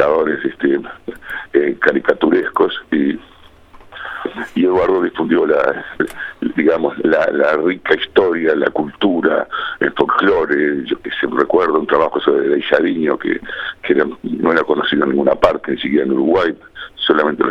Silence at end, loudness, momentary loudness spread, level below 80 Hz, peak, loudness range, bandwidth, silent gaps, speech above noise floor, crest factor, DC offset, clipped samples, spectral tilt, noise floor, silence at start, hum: 0 s; -16 LUFS; 8 LU; -48 dBFS; 0 dBFS; 2 LU; 6.4 kHz; none; 27 dB; 16 dB; under 0.1%; under 0.1%; -6.5 dB/octave; -42 dBFS; 0 s; none